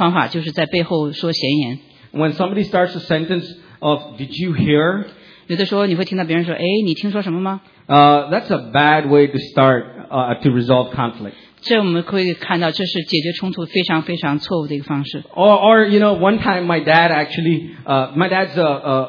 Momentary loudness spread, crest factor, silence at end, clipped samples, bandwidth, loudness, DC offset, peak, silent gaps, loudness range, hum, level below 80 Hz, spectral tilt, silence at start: 11 LU; 16 dB; 0 s; under 0.1%; 5.4 kHz; -16 LUFS; under 0.1%; 0 dBFS; none; 5 LU; none; -54 dBFS; -7.5 dB/octave; 0 s